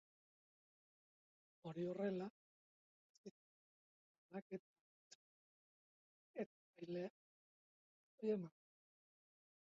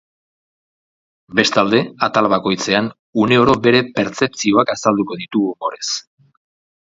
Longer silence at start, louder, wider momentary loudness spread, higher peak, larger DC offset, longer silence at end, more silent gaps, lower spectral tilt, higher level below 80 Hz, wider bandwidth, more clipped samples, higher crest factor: first, 1.65 s vs 1.3 s; second, -49 LUFS vs -16 LUFS; first, 19 LU vs 9 LU; second, -30 dBFS vs 0 dBFS; neither; first, 1.15 s vs 0.85 s; first, 2.30-3.24 s, 3.31-4.29 s, 4.42-4.50 s, 4.59-6.34 s, 6.46-6.74 s, 7.10-8.18 s vs 2.99-3.13 s; first, -7 dB/octave vs -4.5 dB/octave; second, under -90 dBFS vs -52 dBFS; about the same, 7.4 kHz vs 7.8 kHz; neither; about the same, 22 dB vs 18 dB